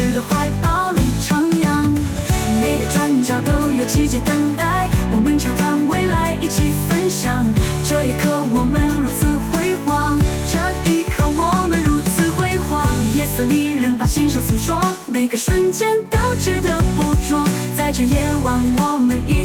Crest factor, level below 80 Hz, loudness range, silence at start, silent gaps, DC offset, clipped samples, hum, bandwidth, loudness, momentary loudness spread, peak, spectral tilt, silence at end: 12 dB; -28 dBFS; 1 LU; 0 s; none; under 0.1%; under 0.1%; none; 19.5 kHz; -18 LUFS; 2 LU; -6 dBFS; -5.5 dB/octave; 0 s